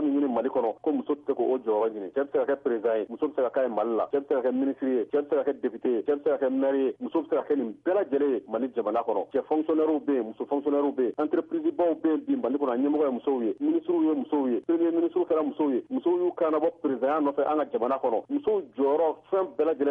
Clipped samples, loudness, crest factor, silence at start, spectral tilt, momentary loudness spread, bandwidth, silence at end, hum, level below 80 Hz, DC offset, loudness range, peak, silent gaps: under 0.1%; -27 LUFS; 10 dB; 0 s; -9 dB/octave; 4 LU; 3.9 kHz; 0 s; none; -74 dBFS; under 0.1%; 1 LU; -16 dBFS; none